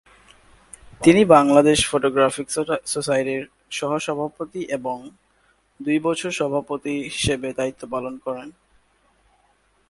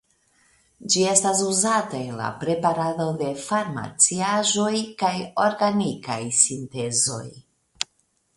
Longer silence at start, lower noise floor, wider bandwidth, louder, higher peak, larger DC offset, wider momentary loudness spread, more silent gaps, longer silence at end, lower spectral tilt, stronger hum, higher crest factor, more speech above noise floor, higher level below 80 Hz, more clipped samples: about the same, 0.85 s vs 0.8 s; second, -62 dBFS vs -68 dBFS; about the same, 11.5 kHz vs 11.5 kHz; about the same, -21 LUFS vs -22 LUFS; about the same, 0 dBFS vs 0 dBFS; neither; first, 16 LU vs 12 LU; neither; first, 1.4 s vs 0.55 s; first, -4.5 dB/octave vs -3 dB/octave; neither; about the same, 22 dB vs 24 dB; about the same, 42 dB vs 45 dB; first, -50 dBFS vs -64 dBFS; neither